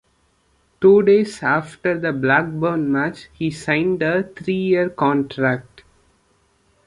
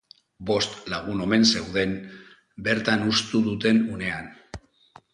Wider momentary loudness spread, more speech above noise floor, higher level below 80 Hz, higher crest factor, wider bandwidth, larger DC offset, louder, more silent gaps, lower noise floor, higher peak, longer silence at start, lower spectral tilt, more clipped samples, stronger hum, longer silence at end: second, 10 LU vs 20 LU; first, 44 dB vs 31 dB; about the same, -56 dBFS vs -52 dBFS; about the same, 18 dB vs 18 dB; about the same, 11 kHz vs 11 kHz; neither; first, -19 LUFS vs -24 LUFS; neither; first, -62 dBFS vs -55 dBFS; first, -2 dBFS vs -6 dBFS; first, 0.8 s vs 0.4 s; first, -7 dB/octave vs -4 dB/octave; neither; neither; first, 1.25 s vs 0.55 s